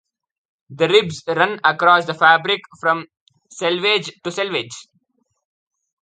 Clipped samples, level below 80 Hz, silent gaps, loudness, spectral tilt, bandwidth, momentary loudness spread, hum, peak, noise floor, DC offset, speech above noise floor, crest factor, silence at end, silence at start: under 0.1%; -66 dBFS; 3.21-3.27 s; -17 LUFS; -3.5 dB/octave; 9.2 kHz; 11 LU; none; 0 dBFS; -67 dBFS; under 0.1%; 49 dB; 20 dB; 1.2 s; 0.7 s